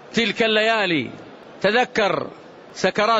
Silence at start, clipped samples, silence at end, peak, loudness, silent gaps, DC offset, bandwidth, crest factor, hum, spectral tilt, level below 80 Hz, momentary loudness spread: 0.05 s; under 0.1%; 0 s; -6 dBFS; -20 LUFS; none; under 0.1%; 8 kHz; 14 dB; none; -4 dB/octave; -58 dBFS; 16 LU